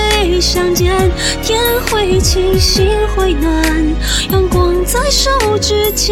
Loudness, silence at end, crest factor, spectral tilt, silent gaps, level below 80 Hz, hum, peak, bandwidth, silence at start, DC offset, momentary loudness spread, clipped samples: -12 LUFS; 0 s; 12 dB; -4 dB/octave; none; -18 dBFS; none; 0 dBFS; 17 kHz; 0 s; under 0.1%; 3 LU; under 0.1%